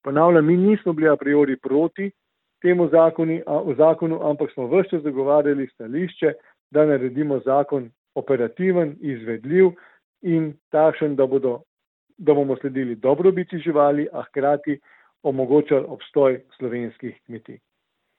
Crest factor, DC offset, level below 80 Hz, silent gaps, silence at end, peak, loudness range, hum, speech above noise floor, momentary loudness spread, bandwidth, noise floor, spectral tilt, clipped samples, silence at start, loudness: 18 dB; under 0.1%; -70 dBFS; 6.60-6.70 s, 7.98-8.05 s, 10.04-10.14 s, 10.61-10.71 s, 11.67-11.77 s, 11.87-12.07 s; 0.65 s; -2 dBFS; 3 LU; none; 55 dB; 12 LU; 4.1 kHz; -75 dBFS; -12 dB/octave; under 0.1%; 0.05 s; -20 LUFS